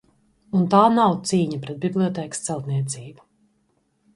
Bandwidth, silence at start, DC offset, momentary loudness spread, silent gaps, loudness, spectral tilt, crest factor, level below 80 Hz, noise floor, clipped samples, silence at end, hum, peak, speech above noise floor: 11.5 kHz; 0.55 s; under 0.1%; 12 LU; none; -21 LUFS; -6 dB/octave; 20 dB; -64 dBFS; -67 dBFS; under 0.1%; 1.05 s; none; -2 dBFS; 46 dB